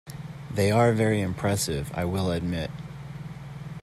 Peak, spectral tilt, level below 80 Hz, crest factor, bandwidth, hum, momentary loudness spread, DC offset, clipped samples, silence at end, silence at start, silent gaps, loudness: -8 dBFS; -5.5 dB/octave; -50 dBFS; 18 dB; 14 kHz; none; 18 LU; under 0.1%; under 0.1%; 0 s; 0.05 s; none; -26 LUFS